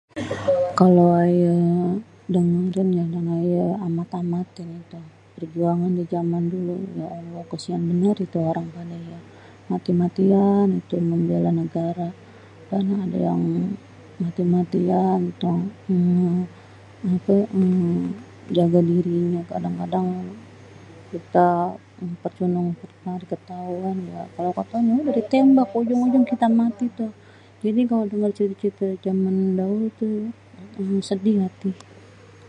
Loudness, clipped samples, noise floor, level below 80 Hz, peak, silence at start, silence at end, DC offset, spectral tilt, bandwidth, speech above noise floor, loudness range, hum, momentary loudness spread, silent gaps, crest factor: -22 LUFS; under 0.1%; -46 dBFS; -60 dBFS; -2 dBFS; 0.15 s; 0.7 s; under 0.1%; -9 dB/octave; 9 kHz; 25 dB; 6 LU; none; 15 LU; none; 20 dB